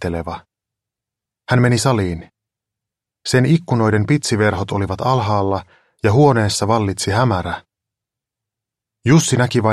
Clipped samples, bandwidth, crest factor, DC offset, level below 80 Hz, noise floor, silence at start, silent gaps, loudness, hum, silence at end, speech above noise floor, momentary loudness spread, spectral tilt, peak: under 0.1%; 13.5 kHz; 16 dB; under 0.1%; -46 dBFS; -85 dBFS; 0 s; none; -17 LUFS; none; 0 s; 70 dB; 12 LU; -5.5 dB/octave; -2 dBFS